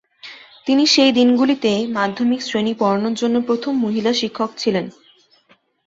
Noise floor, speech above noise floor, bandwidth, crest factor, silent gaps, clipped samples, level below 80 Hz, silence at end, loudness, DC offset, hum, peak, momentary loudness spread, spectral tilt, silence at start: -57 dBFS; 40 dB; 7.8 kHz; 16 dB; none; under 0.1%; -62 dBFS; 0.95 s; -17 LUFS; under 0.1%; none; -2 dBFS; 12 LU; -4 dB/octave; 0.25 s